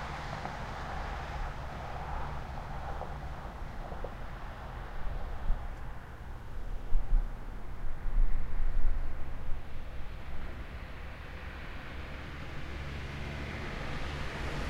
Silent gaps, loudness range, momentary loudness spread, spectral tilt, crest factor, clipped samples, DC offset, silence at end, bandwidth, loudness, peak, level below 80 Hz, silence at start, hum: none; 4 LU; 8 LU; -6 dB/octave; 18 dB; under 0.1%; under 0.1%; 0 s; 7 kHz; -41 LUFS; -14 dBFS; -34 dBFS; 0 s; none